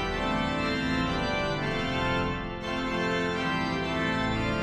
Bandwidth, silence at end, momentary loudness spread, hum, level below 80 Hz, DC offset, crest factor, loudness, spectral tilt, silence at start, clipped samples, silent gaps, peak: 13 kHz; 0 s; 2 LU; none; -42 dBFS; under 0.1%; 14 dB; -28 LUFS; -5.5 dB/octave; 0 s; under 0.1%; none; -16 dBFS